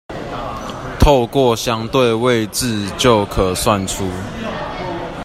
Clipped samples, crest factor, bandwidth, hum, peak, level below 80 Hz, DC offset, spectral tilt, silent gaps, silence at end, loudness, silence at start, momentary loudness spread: under 0.1%; 16 dB; 16 kHz; none; 0 dBFS; -28 dBFS; under 0.1%; -4.5 dB/octave; none; 0 s; -17 LUFS; 0.1 s; 12 LU